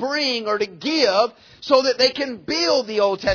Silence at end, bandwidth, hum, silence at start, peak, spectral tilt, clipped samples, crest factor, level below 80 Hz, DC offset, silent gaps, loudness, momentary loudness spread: 0 s; 5.4 kHz; none; 0 s; -2 dBFS; -3 dB/octave; under 0.1%; 18 dB; -50 dBFS; under 0.1%; none; -19 LUFS; 7 LU